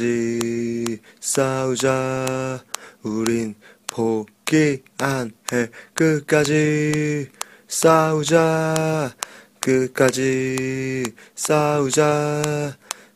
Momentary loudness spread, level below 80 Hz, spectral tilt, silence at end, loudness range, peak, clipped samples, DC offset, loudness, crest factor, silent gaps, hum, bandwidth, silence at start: 11 LU; -58 dBFS; -5 dB/octave; 0.2 s; 4 LU; 0 dBFS; under 0.1%; under 0.1%; -21 LUFS; 20 dB; none; none; 15.5 kHz; 0 s